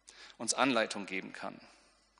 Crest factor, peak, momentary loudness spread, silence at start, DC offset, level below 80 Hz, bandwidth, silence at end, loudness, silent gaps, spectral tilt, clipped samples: 24 dB; -14 dBFS; 20 LU; 0.05 s; under 0.1%; -78 dBFS; 10.5 kHz; 0.5 s; -33 LUFS; none; -2 dB/octave; under 0.1%